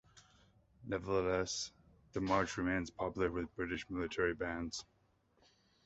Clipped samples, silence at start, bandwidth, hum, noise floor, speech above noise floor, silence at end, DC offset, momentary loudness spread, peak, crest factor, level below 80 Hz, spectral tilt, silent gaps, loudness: under 0.1%; 0.15 s; 8 kHz; none; -74 dBFS; 36 dB; 1.05 s; under 0.1%; 9 LU; -18 dBFS; 22 dB; -58 dBFS; -4 dB/octave; none; -38 LUFS